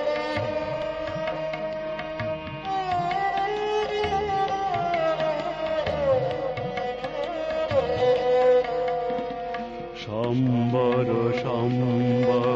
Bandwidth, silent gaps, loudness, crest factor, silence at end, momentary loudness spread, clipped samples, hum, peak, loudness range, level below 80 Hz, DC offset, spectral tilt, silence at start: 7.6 kHz; none; -25 LUFS; 14 dB; 0 s; 9 LU; under 0.1%; none; -12 dBFS; 4 LU; -50 dBFS; under 0.1%; -7 dB/octave; 0 s